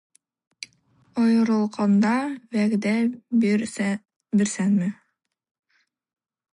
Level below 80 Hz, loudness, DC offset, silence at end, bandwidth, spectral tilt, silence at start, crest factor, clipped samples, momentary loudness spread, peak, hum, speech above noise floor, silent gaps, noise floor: -70 dBFS; -23 LUFS; under 0.1%; 1.6 s; 11.5 kHz; -6 dB/octave; 0.6 s; 14 dB; under 0.1%; 13 LU; -10 dBFS; none; 52 dB; 4.16-4.20 s; -74 dBFS